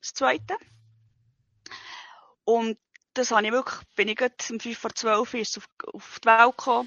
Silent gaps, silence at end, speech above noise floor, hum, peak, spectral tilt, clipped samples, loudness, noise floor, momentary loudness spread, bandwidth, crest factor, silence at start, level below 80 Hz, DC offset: 5.72-5.77 s; 0 s; 43 dB; none; -2 dBFS; -2 dB/octave; under 0.1%; -25 LUFS; -68 dBFS; 21 LU; 7.6 kHz; 24 dB; 0.05 s; -72 dBFS; under 0.1%